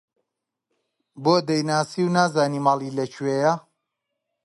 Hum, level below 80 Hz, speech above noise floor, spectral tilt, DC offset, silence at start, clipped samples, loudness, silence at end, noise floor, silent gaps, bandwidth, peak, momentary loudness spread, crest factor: none; -72 dBFS; 61 dB; -5.5 dB/octave; under 0.1%; 1.15 s; under 0.1%; -22 LUFS; 0.85 s; -83 dBFS; none; 11.5 kHz; -6 dBFS; 6 LU; 18 dB